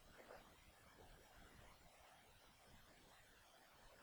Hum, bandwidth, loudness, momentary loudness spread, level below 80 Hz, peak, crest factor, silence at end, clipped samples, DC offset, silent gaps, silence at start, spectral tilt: none; over 20 kHz; -66 LUFS; 5 LU; -74 dBFS; -46 dBFS; 20 dB; 0 s; under 0.1%; under 0.1%; none; 0 s; -3 dB/octave